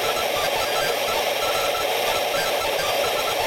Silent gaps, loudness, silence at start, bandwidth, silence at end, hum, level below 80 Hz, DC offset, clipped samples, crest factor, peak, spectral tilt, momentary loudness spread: none; -22 LUFS; 0 s; 16.5 kHz; 0 s; none; -52 dBFS; 0.2%; under 0.1%; 14 dB; -8 dBFS; -1 dB/octave; 0 LU